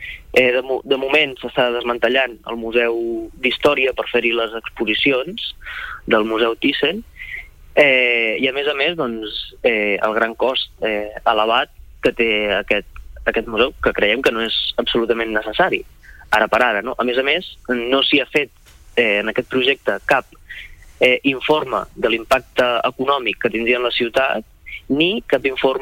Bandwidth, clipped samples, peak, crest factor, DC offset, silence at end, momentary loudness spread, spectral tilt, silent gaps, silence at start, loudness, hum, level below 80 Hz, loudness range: 16.5 kHz; under 0.1%; -2 dBFS; 18 dB; under 0.1%; 0 s; 10 LU; -4.5 dB/octave; none; 0 s; -18 LUFS; none; -44 dBFS; 2 LU